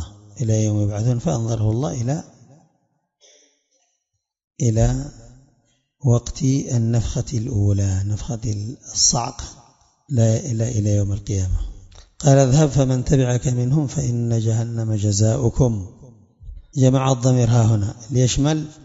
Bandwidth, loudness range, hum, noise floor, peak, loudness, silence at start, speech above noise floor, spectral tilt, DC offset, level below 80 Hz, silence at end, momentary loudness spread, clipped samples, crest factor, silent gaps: 7.8 kHz; 8 LU; none; -76 dBFS; 0 dBFS; -20 LUFS; 0 s; 58 dB; -6 dB/octave; under 0.1%; -36 dBFS; 0 s; 10 LU; under 0.1%; 20 dB; 4.44-4.48 s